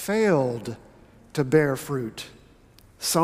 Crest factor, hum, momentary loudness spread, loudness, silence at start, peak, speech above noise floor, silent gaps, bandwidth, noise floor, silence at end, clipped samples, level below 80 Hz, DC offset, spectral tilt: 20 dB; none; 18 LU; -25 LUFS; 0 s; -6 dBFS; 30 dB; none; 16 kHz; -54 dBFS; 0 s; under 0.1%; -58 dBFS; under 0.1%; -5 dB/octave